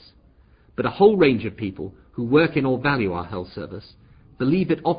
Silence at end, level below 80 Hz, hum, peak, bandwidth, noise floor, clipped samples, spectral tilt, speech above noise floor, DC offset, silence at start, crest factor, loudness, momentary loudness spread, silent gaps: 0 s; -48 dBFS; none; -4 dBFS; 5.2 kHz; -54 dBFS; under 0.1%; -11.5 dB/octave; 33 dB; under 0.1%; 0.8 s; 18 dB; -21 LUFS; 18 LU; none